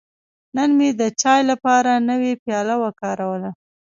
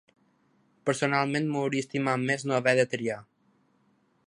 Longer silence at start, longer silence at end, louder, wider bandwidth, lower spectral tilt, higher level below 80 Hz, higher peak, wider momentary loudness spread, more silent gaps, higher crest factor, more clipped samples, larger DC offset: second, 0.55 s vs 0.85 s; second, 0.4 s vs 1.05 s; first, -19 LUFS vs -27 LUFS; second, 7.8 kHz vs 11 kHz; about the same, -4 dB/octave vs -5 dB/octave; first, -68 dBFS vs -74 dBFS; first, -2 dBFS vs -8 dBFS; about the same, 9 LU vs 9 LU; first, 2.39-2.46 s vs none; about the same, 16 dB vs 20 dB; neither; neither